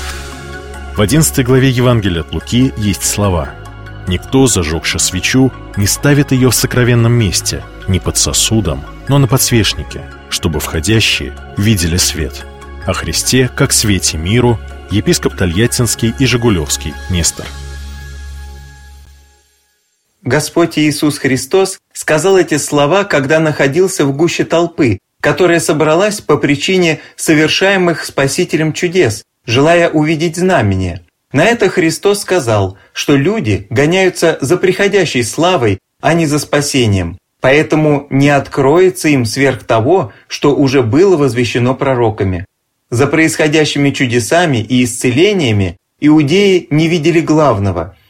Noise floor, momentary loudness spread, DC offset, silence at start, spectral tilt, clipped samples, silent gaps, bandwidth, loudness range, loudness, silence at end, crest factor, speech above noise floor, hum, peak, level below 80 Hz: -61 dBFS; 10 LU; under 0.1%; 0 s; -4.5 dB/octave; under 0.1%; none; 16.5 kHz; 3 LU; -12 LUFS; 0.2 s; 12 dB; 49 dB; none; 0 dBFS; -32 dBFS